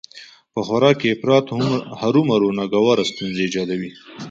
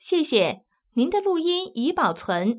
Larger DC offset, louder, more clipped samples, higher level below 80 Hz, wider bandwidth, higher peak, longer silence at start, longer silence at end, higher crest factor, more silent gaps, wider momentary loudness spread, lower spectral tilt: neither; first, -19 LUFS vs -23 LUFS; neither; about the same, -58 dBFS vs -62 dBFS; first, 7.8 kHz vs 4 kHz; first, -2 dBFS vs -6 dBFS; about the same, 0.15 s vs 0.05 s; about the same, 0 s vs 0 s; about the same, 18 dB vs 16 dB; neither; first, 12 LU vs 4 LU; second, -6 dB/octave vs -9.5 dB/octave